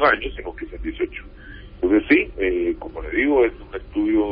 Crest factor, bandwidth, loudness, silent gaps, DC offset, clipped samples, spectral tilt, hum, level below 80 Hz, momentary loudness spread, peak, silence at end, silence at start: 18 dB; 5.2 kHz; -21 LUFS; none; under 0.1%; under 0.1%; -10.5 dB/octave; none; -38 dBFS; 18 LU; -4 dBFS; 0 s; 0 s